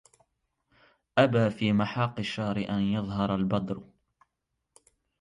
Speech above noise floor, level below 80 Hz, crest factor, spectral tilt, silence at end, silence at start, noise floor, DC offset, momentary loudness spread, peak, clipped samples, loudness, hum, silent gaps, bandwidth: 55 dB; -58 dBFS; 20 dB; -7.5 dB/octave; 1.4 s; 1.15 s; -82 dBFS; under 0.1%; 7 LU; -10 dBFS; under 0.1%; -28 LUFS; none; none; 11 kHz